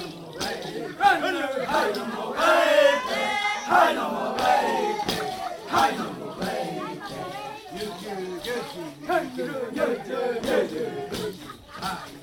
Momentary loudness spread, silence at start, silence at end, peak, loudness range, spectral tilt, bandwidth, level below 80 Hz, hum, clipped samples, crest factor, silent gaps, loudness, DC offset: 14 LU; 0 s; 0 s; -6 dBFS; 9 LU; -3.5 dB/octave; 18 kHz; -58 dBFS; none; under 0.1%; 18 dB; none; -25 LUFS; under 0.1%